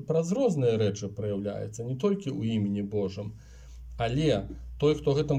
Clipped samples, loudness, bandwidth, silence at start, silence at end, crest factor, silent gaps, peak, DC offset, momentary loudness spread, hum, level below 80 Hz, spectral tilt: under 0.1%; -29 LUFS; 10 kHz; 0 s; 0 s; 16 dB; none; -12 dBFS; under 0.1%; 15 LU; none; -48 dBFS; -7 dB/octave